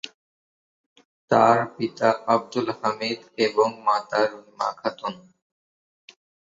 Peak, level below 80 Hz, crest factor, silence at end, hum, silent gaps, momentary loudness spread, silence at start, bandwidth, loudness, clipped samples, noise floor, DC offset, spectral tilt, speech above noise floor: -2 dBFS; -70 dBFS; 22 dB; 1.35 s; none; 0.14-0.96 s, 1.05-1.28 s; 10 LU; 0.05 s; 7.8 kHz; -23 LUFS; under 0.1%; under -90 dBFS; under 0.1%; -5 dB/octave; over 67 dB